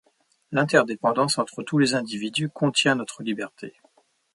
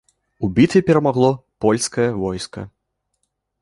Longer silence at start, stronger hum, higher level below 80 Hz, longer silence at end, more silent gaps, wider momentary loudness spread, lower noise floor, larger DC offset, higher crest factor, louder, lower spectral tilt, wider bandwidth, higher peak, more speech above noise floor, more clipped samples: about the same, 0.5 s vs 0.4 s; neither; second, -70 dBFS vs -48 dBFS; second, 0.65 s vs 0.95 s; neither; second, 11 LU vs 15 LU; second, -62 dBFS vs -73 dBFS; neither; about the same, 22 dB vs 18 dB; second, -23 LUFS vs -18 LUFS; second, -4.5 dB/octave vs -6 dB/octave; about the same, 11.5 kHz vs 11.5 kHz; about the same, -2 dBFS vs -2 dBFS; second, 39 dB vs 56 dB; neither